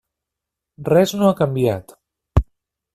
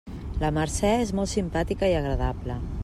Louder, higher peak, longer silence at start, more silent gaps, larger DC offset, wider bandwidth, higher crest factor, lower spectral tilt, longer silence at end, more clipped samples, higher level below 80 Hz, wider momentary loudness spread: first, -19 LUFS vs -26 LUFS; first, -2 dBFS vs -10 dBFS; first, 0.8 s vs 0.05 s; neither; neither; about the same, 15 kHz vs 14 kHz; about the same, 18 dB vs 16 dB; first, -7 dB/octave vs -5.5 dB/octave; first, 0.5 s vs 0 s; neither; about the same, -32 dBFS vs -34 dBFS; first, 14 LU vs 8 LU